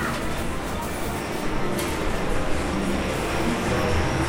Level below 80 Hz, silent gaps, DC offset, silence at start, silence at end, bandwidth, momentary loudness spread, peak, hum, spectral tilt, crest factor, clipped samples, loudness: -32 dBFS; none; under 0.1%; 0 s; 0 s; 16 kHz; 5 LU; -10 dBFS; none; -5 dB/octave; 14 dB; under 0.1%; -26 LUFS